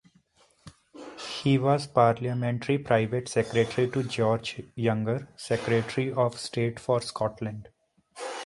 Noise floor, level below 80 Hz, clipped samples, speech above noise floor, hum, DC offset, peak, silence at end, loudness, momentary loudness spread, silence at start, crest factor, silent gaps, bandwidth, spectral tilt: -63 dBFS; -60 dBFS; under 0.1%; 37 dB; none; under 0.1%; -6 dBFS; 0 s; -27 LUFS; 13 LU; 0.65 s; 20 dB; none; 11.5 kHz; -6 dB/octave